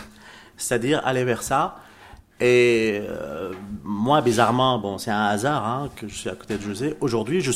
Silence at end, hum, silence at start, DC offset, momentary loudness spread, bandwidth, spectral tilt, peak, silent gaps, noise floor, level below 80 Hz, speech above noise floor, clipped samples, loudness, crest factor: 0 s; none; 0 s; under 0.1%; 13 LU; 16 kHz; -5 dB/octave; -2 dBFS; none; -47 dBFS; -52 dBFS; 25 dB; under 0.1%; -23 LUFS; 20 dB